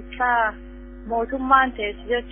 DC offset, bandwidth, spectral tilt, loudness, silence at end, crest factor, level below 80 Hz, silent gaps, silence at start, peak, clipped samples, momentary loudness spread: under 0.1%; 3.6 kHz; -8.5 dB/octave; -22 LUFS; 0 s; 20 dB; -40 dBFS; none; 0 s; -2 dBFS; under 0.1%; 22 LU